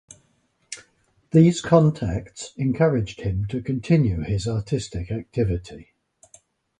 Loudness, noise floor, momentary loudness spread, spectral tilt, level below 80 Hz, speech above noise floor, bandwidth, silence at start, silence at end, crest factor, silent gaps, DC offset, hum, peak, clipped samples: -22 LUFS; -66 dBFS; 19 LU; -7 dB/octave; -42 dBFS; 45 dB; 10 kHz; 0.7 s; 0.95 s; 20 dB; none; under 0.1%; none; -4 dBFS; under 0.1%